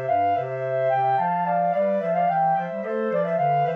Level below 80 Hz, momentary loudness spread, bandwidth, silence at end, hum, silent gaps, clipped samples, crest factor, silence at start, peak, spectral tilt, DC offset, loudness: -82 dBFS; 4 LU; 5.2 kHz; 0 s; 50 Hz at -60 dBFS; none; under 0.1%; 10 dB; 0 s; -12 dBFS; -9 dB/octave; under 0.1%; -23 LUFS